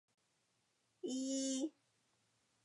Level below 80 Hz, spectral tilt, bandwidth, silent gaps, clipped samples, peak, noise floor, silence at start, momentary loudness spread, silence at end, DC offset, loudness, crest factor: under -90 dBFS; -2 dB/octave; 11.5 kHz; none; under 0.1%; -30 dBFS; -81 dBFS; 1.05 s; 8 LU; 0.95 s; under 0.1%; -42 LUFS; 16 dB